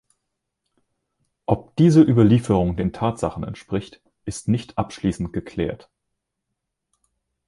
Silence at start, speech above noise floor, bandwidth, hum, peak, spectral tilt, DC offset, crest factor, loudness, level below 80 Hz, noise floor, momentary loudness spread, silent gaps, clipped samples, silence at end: 1.5 s; 60 dB; 11.5 kHz; none; -2 dBFS; -7.5 dB/octave; under 0.1%; 20 dB; -21 LUFS; -44 dBFS; -80 dBFS; 17 LU; none; under 0.1%; 1.75 s